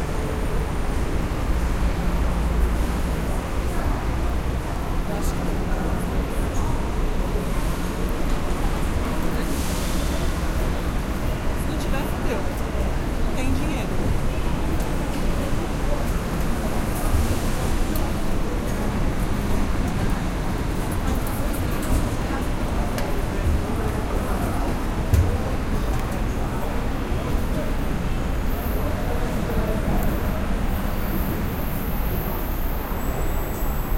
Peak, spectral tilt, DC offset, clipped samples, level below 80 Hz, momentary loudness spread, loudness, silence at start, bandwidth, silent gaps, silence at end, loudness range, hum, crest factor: -6 dBFS; -6 dB/octave; under 0.1%; under 0.1%; -24 dBFS; 3 LU; -26 LUFS; 0 s; 16.5 kHz; none; 0 s; 1 LU; none; 16 dB